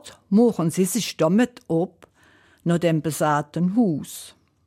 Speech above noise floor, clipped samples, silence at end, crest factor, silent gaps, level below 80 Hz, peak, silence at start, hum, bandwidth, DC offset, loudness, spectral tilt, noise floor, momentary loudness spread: 35 dB; under 0.1%; 0.4 s; 14 dB; none; -64 dBFS; -8 dBFS; 0.05 s; none; 16.5 kHz; under 0.1%; -22 LUFS; -6 dB/octave; -56 dBFS; 11 LU